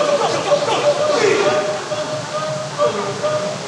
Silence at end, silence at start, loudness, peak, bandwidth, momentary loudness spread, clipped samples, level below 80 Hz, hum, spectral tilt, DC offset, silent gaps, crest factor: 0 s; 0 s; -18 LUFS; -4 dBFS; 11.5 kHz; 8 LU; under 0.1%; -60 dBFS; none; -3.5 dB/octave; under 0.1%; none; 14 dB